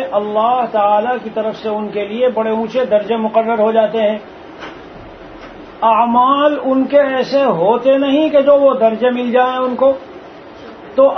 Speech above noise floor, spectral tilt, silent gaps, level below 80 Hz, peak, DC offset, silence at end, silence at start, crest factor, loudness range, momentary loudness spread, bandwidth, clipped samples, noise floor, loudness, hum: 21 dB; -7 dB/octave; none; -52 dBFS; 0 dBFS; under 0.1%; 0 s; 0 s; 14 dB; 4 LU; 23 LU; 6.2 kHz; under 0.1%; -34 dBFS; -14 LUFS; none